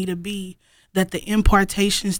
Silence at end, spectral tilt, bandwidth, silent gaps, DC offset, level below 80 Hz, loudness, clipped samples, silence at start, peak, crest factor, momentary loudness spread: 0 s; -4.5 dB/octave; 18 kHz; none; under 0.1%; -28 dBFS; -21 LUFS; under 0.1%; 0 s; -2 dBFS; 18 dB; 13 LU